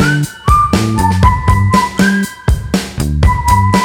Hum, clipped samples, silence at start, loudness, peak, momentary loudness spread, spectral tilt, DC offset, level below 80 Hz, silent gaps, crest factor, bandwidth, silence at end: none; under 0.1%; 0 s; -12 LUFS; 0 dBFS; 6 LU; -5.5 dB/octave; under 0.1%; -18 dBFS; none; 12 dB; 17 kHz; 0 s